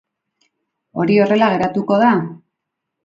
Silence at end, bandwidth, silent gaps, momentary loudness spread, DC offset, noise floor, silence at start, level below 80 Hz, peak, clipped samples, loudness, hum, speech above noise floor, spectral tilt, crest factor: 0.7 s; 7.6 kHz; none; 12 LU; under 0.1%; -79 dBFS; 0.95 s; -58 dBFS; 0 dBFS; under 0.1%; -15 LUFS; none; 64 dB; -8 dB/octave; 18 dB